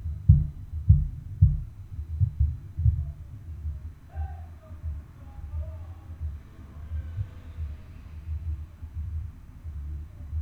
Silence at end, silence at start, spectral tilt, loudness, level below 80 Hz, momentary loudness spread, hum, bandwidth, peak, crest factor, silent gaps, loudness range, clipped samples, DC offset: 0 s; 0 s; -10.5 dB/octave; -30 LUFS; -34 dBFS; 20 LU; none; 2.9 kHz; -4 dBFS; 24 dB; none; 12 LU; under 0.1%; under 0.1%